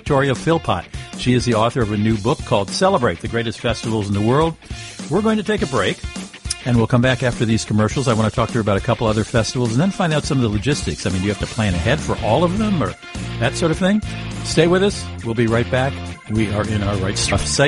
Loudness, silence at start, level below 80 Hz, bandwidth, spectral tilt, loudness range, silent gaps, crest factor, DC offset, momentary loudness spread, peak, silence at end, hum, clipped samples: -19 LUFS; 0.05 s; -36 dBFS; 11.5 kHz; -5.5 dB/octave; 2 LU; none; 16 dB; under 0.1%; 8 LU; -2 dBFS; 0 s; none; under 0.1%